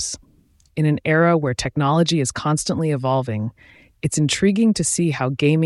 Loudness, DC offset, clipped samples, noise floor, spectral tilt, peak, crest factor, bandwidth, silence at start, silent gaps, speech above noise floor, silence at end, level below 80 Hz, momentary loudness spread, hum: -19 LUFS; under 0.1%; under 0.1%; -56 dBFS; -5 dB/octave; -6 dBFS; 14 dB; 12 kHz; 0 s; none; 37 dB; 0 s; -50 dBFS; 10 LU; none